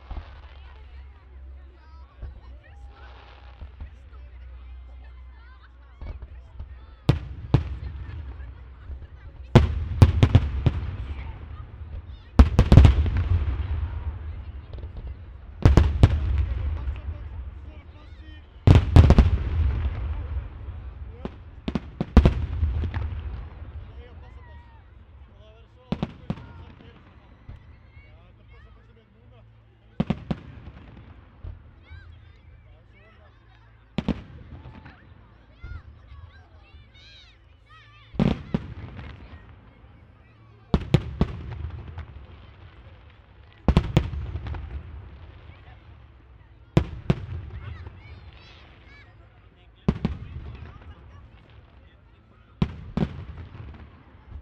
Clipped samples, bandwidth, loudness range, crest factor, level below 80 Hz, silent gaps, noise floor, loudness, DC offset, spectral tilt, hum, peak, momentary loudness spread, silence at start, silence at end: under 0.1%; 8.2 kHz; 22 LU; 26 dB; -30 dBFS; none; -54 dBFS; -24 LUFS; under 0.1%; -8 dB/octave; none; 0 dBFS; 27 LU; 0.1 s; 0 s